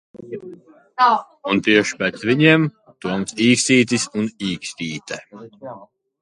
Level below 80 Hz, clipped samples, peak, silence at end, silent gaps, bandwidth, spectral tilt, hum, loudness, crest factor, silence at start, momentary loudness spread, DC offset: -60 dBFS; under 0.1%; 0 dBFS; 0.4 s; none; 11.5 kHz; -4 dB/octave; none; -18 LUFS; 20 dB; 0.15 s; 20 LU; under 0.1%